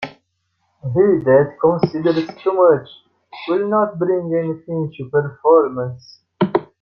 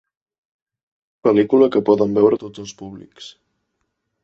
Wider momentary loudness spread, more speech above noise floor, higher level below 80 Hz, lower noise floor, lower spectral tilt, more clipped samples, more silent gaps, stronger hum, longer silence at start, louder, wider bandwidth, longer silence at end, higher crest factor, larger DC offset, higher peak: second, 12 LU vs 22 LU; second, 52 dB vs 57 dB; about the same, -58 dBFS vs -60 dBFS; second, -69 dBFS vs -74 dBFS; first, -9.5 dB/octave vs -7 dB/octave; neither; neither; neither; second, 0 s vs 1.25 s; about the same, -17 LUFS vs -16 LUFS; second, 6.2 kHz vs 7.6 kHz; second, 0.15 s vs 0.95 s; about the same, 16 dB vs 18 dB; neither; about the same, -2 dBFS vs -2 dBFS